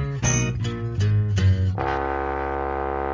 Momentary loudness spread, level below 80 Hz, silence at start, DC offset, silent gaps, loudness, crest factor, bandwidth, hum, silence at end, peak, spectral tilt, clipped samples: 6 LU; -32 dBFS; 0 s; under 0.1%; none; -24 LUFS; 14 dB; 7.6 kHz; none; 0 s; -8 dBFS; -5.5 dB/octave; under 0.1%